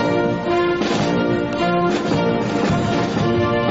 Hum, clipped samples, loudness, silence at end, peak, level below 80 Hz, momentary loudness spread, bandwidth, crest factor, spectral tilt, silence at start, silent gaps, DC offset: none; under 0.1%; -19 LUFS; 0 s; -8 dBFS; -44 dBFS; 1 LU; 8 kHz; 10 dB; -5.5 dB/octave; 0 s; none; 0.2%